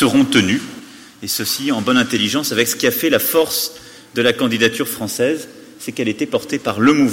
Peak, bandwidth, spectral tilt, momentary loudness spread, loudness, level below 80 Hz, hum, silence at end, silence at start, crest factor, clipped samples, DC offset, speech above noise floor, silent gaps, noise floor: -2 dBFS; 17 kHz; -3.5 dB/octave; 13 LU; -17 LUFS; -56 dBFS; none; 0 s; 0 s; 16 dB; under 0.1%; under 0.1%; 21 dB; none; -37 dBFS